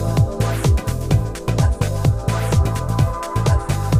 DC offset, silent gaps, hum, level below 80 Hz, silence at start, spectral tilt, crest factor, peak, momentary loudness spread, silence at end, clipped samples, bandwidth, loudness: under 0.1%; none; none; -24 dBFS; 0 s; -6.5 dB/octave; 14 dB; -4 dBFS; 2 LU; 0 s; under 0.1%; 15.5 kHz; -19 LUFS